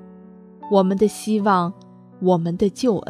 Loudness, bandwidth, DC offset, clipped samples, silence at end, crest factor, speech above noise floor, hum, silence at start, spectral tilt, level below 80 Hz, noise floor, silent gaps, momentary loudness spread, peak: -20 LUFS; 14 kHz; under 0.1%; under 0.1%; 0.1 s; 16 dB; 25 dB; none; 0 s; -7 dB/octave; -56 dBFS; -44 dBFS; none; 6 LU; -4 dBFS